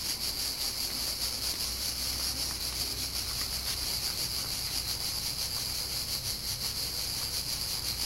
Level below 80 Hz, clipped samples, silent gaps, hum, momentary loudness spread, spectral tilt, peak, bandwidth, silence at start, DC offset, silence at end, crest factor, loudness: -48 dBFS; under 0.1%; none; none; 1 LU; -1 dB/octave; -16 dBFS; 16 kHz; 0 s; under 0.1%; 0 s; 16 dB; -31 LUFS